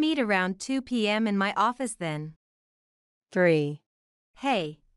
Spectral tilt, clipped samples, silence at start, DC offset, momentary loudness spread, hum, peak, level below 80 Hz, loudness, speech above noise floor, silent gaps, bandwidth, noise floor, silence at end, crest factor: -5 dB/octave; under 0.1%; 0 s; under 0.1%; 10 LU; none; -10 dBFS; -68 dBFS; -27 LUFS; over 64 dB; 2.36-3.21 s, 3.86-4.34 s; 12 kHz; under -90 dBFS; 0.2 s; 18 dB